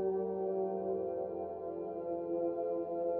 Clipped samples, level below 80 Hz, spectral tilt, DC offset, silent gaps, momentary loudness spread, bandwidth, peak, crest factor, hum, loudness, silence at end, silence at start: under 0.1%; -72 dBFS; -10.5 dB/octave; under 0.1%; none; 5 LU; 2.7 kHz; -26 dBFS; 12 dB; none; -37 LUFS; 0 s; 0 s